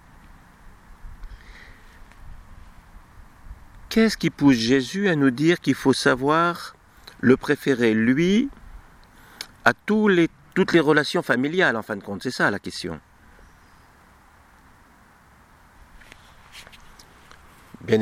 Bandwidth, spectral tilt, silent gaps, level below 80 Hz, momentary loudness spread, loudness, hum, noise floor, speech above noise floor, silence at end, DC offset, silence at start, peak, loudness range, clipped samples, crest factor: 15.5 kHz; -5.5 dB/octave; none; -48 dBFS; 15 LU; -21 LUFS; none; -53 dBFS; 33 dB; 0 s; under 0.1%; 0.65 s; 0 dBFS; 10 LU; under 0.1%; 24 dB